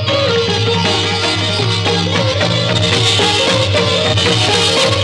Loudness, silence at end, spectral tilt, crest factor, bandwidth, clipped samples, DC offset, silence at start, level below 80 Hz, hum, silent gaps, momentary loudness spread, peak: -12 LUFS; 0 s; -4 dB/octave; 12 dB; 12 kHz; under 0.1%; under 0.1%; 0 s; -42 dBFS; none; none; 3 LU; -2 dBFS